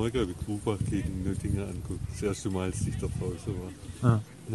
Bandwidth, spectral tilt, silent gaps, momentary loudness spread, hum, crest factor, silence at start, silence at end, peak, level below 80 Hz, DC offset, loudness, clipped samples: 12 kHz; -6.5 dB/octave; none; 10 LU; none; 22 dB; 0 s; 0 s; -10 dBFS; -42 dBFS; under 0.1%; -32 LUFS; under 0.1%